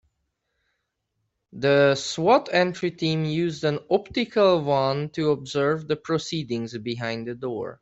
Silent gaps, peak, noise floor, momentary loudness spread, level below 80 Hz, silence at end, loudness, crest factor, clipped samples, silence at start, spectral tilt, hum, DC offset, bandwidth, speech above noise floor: none; -6 dBFS; -77 dBFS; 11 LU; -62 dBFS; 0.05 s; -24 LUFS; 18 dB; under 0.1%; 1.55 s; -5.5 dB/octave; none; under 0.1%; 8.2 kHz; 54 dB